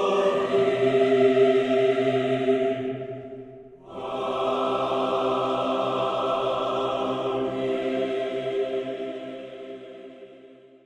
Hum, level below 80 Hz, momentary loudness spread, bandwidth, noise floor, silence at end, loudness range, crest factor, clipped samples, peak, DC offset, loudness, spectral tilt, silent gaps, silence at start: none; -64 dBFS; 19 LU; 9.2 kHz; -50 dBFS; 0.3 s; 6 LU; 16 dB; under 0.1%; -8 dBFS; under 0.1%; -24 LUFS; -6 dB/octave; none; 0 s